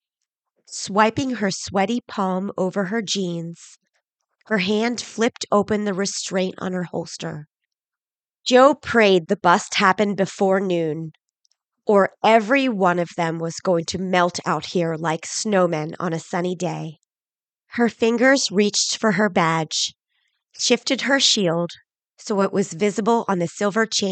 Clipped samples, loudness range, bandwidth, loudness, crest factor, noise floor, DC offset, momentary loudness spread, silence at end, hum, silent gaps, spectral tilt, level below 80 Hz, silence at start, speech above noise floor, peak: under 0.1%; 6 LU; 9.2 kHz; -20 LUFS; 20 dB; under -90 dBFS; under 0.1%; 11 LU; 0 s; none; none; -4 dB/octave; -64 dBFS; 0.7 s; over 70 dB; -2 dBFS